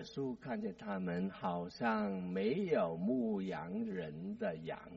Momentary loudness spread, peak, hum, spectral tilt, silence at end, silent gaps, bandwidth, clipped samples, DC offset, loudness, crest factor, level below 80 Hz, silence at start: 7 LU; -22 dBFS; none; -6 dB/octave; 0 s; none; 7.6 kHz; under 0.1%; under 0.1%; -39 LUFS; 16 dB; -70 dBFS; 0 s